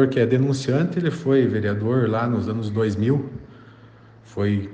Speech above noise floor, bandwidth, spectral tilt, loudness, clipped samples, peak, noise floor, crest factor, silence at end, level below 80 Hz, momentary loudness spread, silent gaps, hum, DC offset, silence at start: 27 dB; 9 kHz; -8 dB/octave; -22 LUFS; under 0.1%; -4 dBFS; -47 dBFS; 16 dB; 0 s; -56 dBFS; 6 LU; none; none; under 0.1%; 0 s